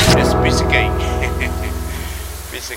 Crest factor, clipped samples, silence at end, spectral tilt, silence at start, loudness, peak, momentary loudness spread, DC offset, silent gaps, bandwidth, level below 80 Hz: 16 dB; under 0.1%; 0 s; -4.5 dB/octave; 0 s; -18 LUFS; 0 dBFS; 13 LU; under 0.1%; none; 16.5 kHz; -24 dBFS